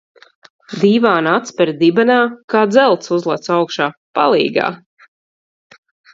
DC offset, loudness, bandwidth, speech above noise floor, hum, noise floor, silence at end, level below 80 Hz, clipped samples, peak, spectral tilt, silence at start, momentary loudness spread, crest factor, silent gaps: under 0.1%; -15 LUFS; 7.8 kHz; over 76 dB; none; under -90 dBFS; 1.35 s; -64 dBFS; under 0.1%; 0 dBFS; -5.5 dB/octave; 0.7 s; 7 LU; 16 dB; 2.44-2.48 s, 3.97-4.14 s